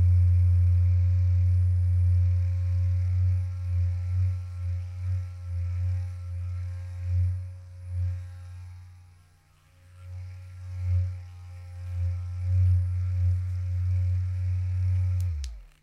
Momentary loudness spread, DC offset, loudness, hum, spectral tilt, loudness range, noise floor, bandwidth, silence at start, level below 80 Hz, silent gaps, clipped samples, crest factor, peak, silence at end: 18 LU; under 0.1%; -27 LUFS; none; -8 dB/octave; 12 LU; -59 dBFS; 2.6 kHz; 0 s; -40 dBFS; none; under 0.1%; 10 dB; -16 dBFS; 0.15 s